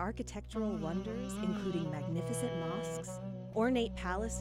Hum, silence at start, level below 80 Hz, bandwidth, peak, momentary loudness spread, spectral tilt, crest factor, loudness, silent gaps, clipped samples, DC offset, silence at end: none; 0 s; -50 dBFS; 16 kHz; -20 dBFS; 9 LU; -5.5 dB/octave; 16 dB; -37 LUFS; none; under 0.1%; under 0.1%; 0 s